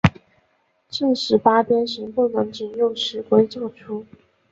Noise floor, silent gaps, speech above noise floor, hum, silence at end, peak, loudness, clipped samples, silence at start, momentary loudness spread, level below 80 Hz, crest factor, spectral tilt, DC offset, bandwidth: -65 dBFS; none; 45 dB; none; 0.5 s; -2 dBFS; -21 LUFS; under 0.1%; 0.05 s; 15 LU; -46 dBFS; 20 dB; -6 dB/octave; under 0.1%; 7.8 kHz